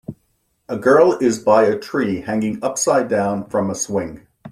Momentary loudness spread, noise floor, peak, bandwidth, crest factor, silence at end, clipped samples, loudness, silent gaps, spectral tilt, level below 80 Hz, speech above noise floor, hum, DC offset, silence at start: 10 LU; -66 dBFS; -2 dBFS; 14.5 kHz; 18 dB; 0 s; under 0.1%; -18 LUFS; none; -5 dB/octave; -56 dBFS; 49 dB; none; under 0.1%; 0.1 s